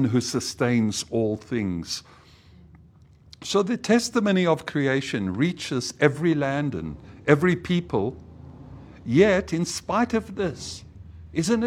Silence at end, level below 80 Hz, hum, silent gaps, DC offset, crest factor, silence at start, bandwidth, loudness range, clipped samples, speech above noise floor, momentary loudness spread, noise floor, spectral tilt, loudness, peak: 0 s; -52 dBFS; none; none; under 0.1%; 22 dB; 0 s; 15.5 kHz; 4 LU; under 0.1%; 29 dB; 15 LU; -52 dBFS; -5.5 dB/octave; -24 LUFS; -2 dBFS